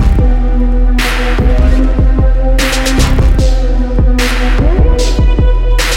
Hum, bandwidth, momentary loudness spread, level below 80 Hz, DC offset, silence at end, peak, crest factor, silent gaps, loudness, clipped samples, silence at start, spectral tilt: none; 14.5 kHz; 2 LU; -8 dBFS; under 0.1%; 0 s; 0 dBFS; 8 dB; none; -12 LUFS; under 0.1%; 0 s; -5.5 dB/octave